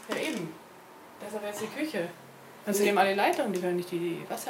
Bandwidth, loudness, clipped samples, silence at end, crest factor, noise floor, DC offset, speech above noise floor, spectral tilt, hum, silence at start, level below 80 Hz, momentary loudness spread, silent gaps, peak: 16.5 kHz; -30 LUFS; under 0.1%; 0 s; 20 dB; -51 dBFS; under 0.1%; 22 dB; -4 dB/octave; none; 0 s; -80 dBFS; 25 LU; none; -10 dBFS